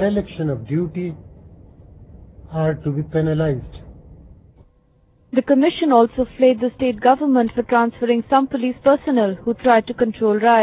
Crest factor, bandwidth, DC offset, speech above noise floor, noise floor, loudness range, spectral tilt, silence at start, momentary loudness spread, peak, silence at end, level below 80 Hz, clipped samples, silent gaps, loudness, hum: 18 dB; 4 kHz; under 0.1%; 39 dB; -56 dBFS; 8 LU; -11 dB/octave; 0 s; 9 LU; -2 dBFS; 0 s; -46 dBFS; under 0.1%; none; -18 LUFS; none